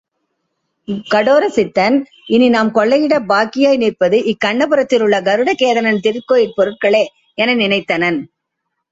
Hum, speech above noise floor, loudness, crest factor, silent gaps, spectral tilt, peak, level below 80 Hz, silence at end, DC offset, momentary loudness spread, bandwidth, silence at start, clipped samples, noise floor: none; 61 dB; -14 LUFS; 14 dB; none; -5 dB/octave; -2 dBFS; -58 dBFS; 0.65 s; under 0.1%; 5 LU; 7.8 kHz; 0.9 s; under 0.1%; -74 dBFS